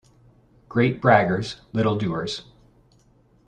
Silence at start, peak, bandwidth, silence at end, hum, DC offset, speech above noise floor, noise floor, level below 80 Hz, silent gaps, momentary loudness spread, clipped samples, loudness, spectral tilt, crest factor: 0.7 s; -2 dBFS; 10 kHz; 1.05 s; none; under 0.1%; 37 dB; -58 dBFS; -56 dBFS; none; 12 LU; under 0.1%; -22 LUFS; -6.5 dB/octave; 22 dB